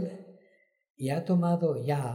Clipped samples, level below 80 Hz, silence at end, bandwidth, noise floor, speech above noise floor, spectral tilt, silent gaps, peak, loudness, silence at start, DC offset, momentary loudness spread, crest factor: under 0.1%; -76 dBFS; 0 s; 12.5 kHz; -66 dBFS; 38 dB; -8 dB/octave; 0.90-0.94 s; -16 dBFS; -29 LUFS; 0 s; under 0.1%; 12 LU; 14 dB